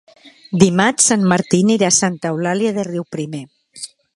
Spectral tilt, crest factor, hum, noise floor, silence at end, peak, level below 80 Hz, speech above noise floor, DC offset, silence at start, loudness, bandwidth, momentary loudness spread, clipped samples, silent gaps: -4 dB/octave; 18 dB; none; -37 dBFS; 0.3 s; 0 dBFS; -56 dBFS; 21 dB; under 0.1%; 0.25 s; -15 LUFS; 11.5 kHz; 17 LU; under 0.1%; none